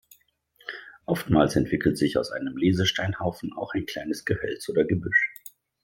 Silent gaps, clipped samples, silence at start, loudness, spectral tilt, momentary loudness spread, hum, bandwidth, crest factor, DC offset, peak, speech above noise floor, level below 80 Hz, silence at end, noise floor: none; under 0.1%; 0.65 s; -25 LUFS; -5.5 dB/octave; 17 LU; none; 16.5 kHz; 20 dB; under 0.1%; -6 dBFS; 37 dB; -52 dBFS; 0.5 s; -62 dBFS